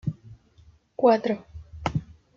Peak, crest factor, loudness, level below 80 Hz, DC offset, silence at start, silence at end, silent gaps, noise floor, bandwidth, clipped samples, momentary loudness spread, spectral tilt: -6 dBFS; 22 dB; -26 LUFS; -50 dBFS; under 0.1%; 0.05 s; 0.35 s; none; -56 dBFS; 7.4 kHz; under 0.1%; 23 LU; -7.5 dB/octave